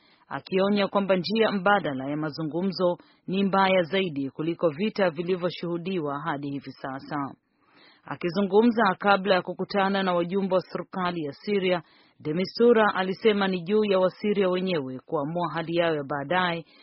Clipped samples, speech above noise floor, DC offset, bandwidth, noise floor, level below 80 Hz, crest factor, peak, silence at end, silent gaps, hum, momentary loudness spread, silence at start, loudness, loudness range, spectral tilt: under 0.1%; 33 dB; under 0.1%; 5.8 kHz; -58 dBFS; -68 dBFS; 20 dB; -6 dBFS; 0.2 s; none; none; 11 LU; 0.3 s; -25 LUFS; 5 LU; -4 dB/octave